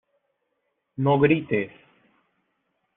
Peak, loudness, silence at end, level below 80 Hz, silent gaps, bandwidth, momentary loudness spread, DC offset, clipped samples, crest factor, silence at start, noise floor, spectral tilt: -6 dBFS; -22 LUFS; 1.3 s; -62 dBFS; none; 3.9 kHz; 17 LU; under 0.1%; under 0.1%; 20 dB; 1 s; -76 dBFS; -6.5 dB/octave